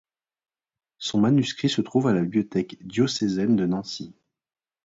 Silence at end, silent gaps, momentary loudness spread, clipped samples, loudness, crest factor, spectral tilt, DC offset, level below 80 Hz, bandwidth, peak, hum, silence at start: 0.75 s; none; 11 LU; under 0.1%; -24 LUFS; 18 dB; -6 dB/octave; under 0.1%; -62 dBFS; 8 kHz; -8 dBFS; none; 1 s